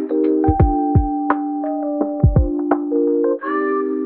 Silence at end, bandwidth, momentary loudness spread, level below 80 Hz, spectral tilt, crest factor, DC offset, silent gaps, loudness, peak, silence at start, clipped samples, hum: 0 s; 3.2 kHz; 6 LU; -26 dBFS; -10 dB/octave; 16 dB; under 0.1%; none; -18 LUFS; -2 dBFS; 0 s; under 0.1%; none